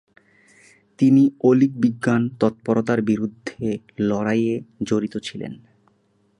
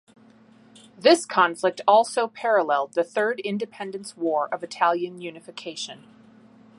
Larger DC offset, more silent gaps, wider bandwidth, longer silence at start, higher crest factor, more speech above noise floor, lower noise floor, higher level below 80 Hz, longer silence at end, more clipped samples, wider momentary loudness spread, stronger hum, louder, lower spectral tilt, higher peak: neither; neither; about the same, 10.5 kHz vs 11.5 kHz; about the same, 1 s vs 1 s; about the same, 18 dB vs 20 dB; first, 43 dB vs 30 dB; first, -63 dBFS vs -53 dBFS; first, -60 dBFS vs -78 dBFS; about the same, 0.85 s vs 0.8 s; neither; about the same, 13 LU vs 15 LU; neither; about the same, -21 LUFS vs -23 LUFS; first, -7.5 dB/octave vs -3.5 dB/octave; about the same, -4 dBFS vs -4 dBFS